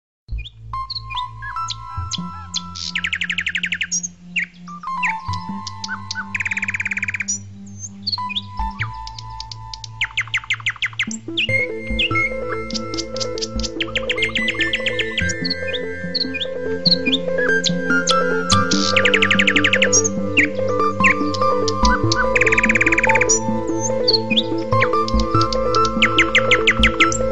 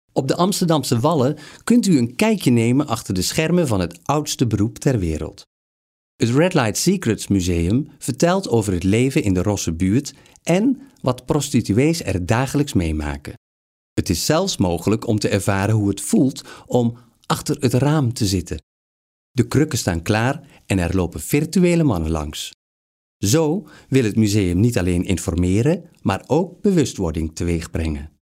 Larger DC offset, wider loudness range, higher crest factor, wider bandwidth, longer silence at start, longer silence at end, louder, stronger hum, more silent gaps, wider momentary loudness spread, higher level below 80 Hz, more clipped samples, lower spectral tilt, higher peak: first, 2% vs under 0.1%; first, 8 LU vs 3 LU; about the same, 18 dB vs 16 dB; second, 11 kHz vs 16 kHz; about the same, 0.25 s vs 0.15 s; second, 0 s vs 0.2 s; about the same, -18 LUFS vs -20 LUFS; neither; second, none vs 5.47-6.19 s, 13.37-13.96 s, 18.63-19.35 s, 22.54-23.20 s; first, 13 LU vs 8 LU; about the same, -36 dBFS vs -38 dBFS; neither; second, -3 dB/octave vs -5.5 dB/octave; about the same, -2 dBFS vs -4 dBFS